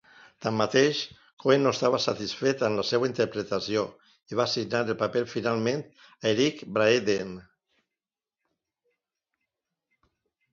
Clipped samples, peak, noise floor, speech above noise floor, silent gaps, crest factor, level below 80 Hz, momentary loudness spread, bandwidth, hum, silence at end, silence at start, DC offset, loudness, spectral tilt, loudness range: under 0.1%; -8 dBFS; under -90 dBFS; over 64 dB; 1.33-1.37 s; 20 dB; -66 dBFS; 10 LU; 7.6 kHz; none; 3.1 s; 0.4 s; under 0.1%; -27 LUFS; -4.5 dB/octave; 4 LU